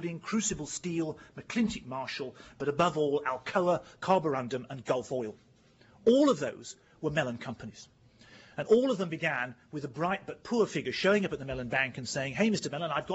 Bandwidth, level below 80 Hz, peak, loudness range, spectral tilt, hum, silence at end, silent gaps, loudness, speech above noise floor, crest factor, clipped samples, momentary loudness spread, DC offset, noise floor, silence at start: 8 kHz; -62 dBFS; -12 dBFS; 2 LU; -4.5 dB/octave; none; 0 s; none; -31 LUFS; 30 dB; 18 dB; under 0.1%; 14 LU; under 0.1%; -61 dBFS; 0 s